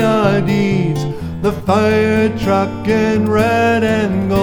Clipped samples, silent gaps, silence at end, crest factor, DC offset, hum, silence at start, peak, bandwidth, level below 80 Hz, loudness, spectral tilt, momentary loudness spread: under 0.1%; none; 0 s; 14 dB; under 0.1%; none; 0 s; 0 dBFS; 19 kHz; -36 dBFS; -15 LUFS; -7 dB/octave; 6 LU